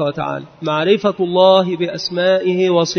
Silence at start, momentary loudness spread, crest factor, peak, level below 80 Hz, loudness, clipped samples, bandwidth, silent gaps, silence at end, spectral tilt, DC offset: 0 s; 11 LU; 16 dB; 0 dBFS; -58 dBFS; -16 LUFS; under 0.1%; 6.6 kHz; none; 0 s; -5.5 dB/octave; under 0.1%